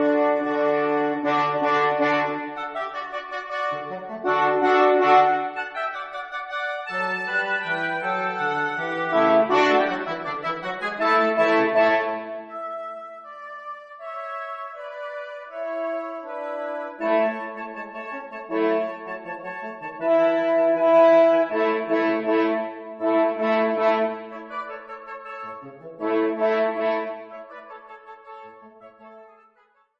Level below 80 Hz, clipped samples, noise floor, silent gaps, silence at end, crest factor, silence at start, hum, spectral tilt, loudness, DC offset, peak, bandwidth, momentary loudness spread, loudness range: -74 dBFS; under 0.1%; -62 dBFS; none; 0.75 s; 20 dB; 0 s; none; -5.5 dB/octave; -23 LUFS; under 0.1%; -4 dBFS; 7.8 kHz; 18 LU; 10 LU